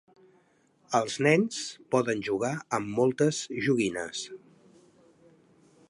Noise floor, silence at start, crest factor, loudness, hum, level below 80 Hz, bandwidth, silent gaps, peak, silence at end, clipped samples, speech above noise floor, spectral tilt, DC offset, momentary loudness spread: -66 dBFS; 0.9 s; 22 dB; -28 LUFS; none; -70 dBFS; 11.5 kHz; none; -8 dBFS; 1.55 s; under 0.1%; 38 dB; -5 dB/octave; under 0.1%; 12 LU